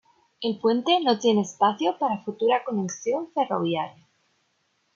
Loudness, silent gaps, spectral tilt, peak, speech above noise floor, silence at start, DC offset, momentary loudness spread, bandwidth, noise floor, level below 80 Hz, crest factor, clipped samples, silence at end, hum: -24 LUFS; none; -4.5 dB/octave; -8 dBFS; 47 dB; 0.4 s; under 0.1%; 8 LU; 7.6 kHz; -71 dBFS; -76 dBFS; 18 dB; under 0.1%; 1.05 s; none